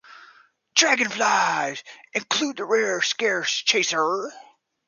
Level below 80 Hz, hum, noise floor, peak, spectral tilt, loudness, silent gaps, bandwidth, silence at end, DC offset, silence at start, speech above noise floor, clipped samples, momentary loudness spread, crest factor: -78 dBFS; none; -55 dBFS; -4 dBFS; -1 dB/octave; -22 LUFS; none; 10.5 kHz; 0.5 s; under 0.1%; 0.1 s; 32 dB; under 0.1%; 11 LU; 20 dB